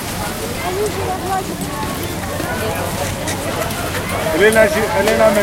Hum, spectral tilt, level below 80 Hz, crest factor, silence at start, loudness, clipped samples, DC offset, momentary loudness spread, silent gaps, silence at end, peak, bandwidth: none; -4 dB/octave; -36 dBFS; 18 dB; 0 s; -18 LUFS; under 0.1%; under 0.1%; 10 LU; none; 0 s; 0 dBFS; 17 kHz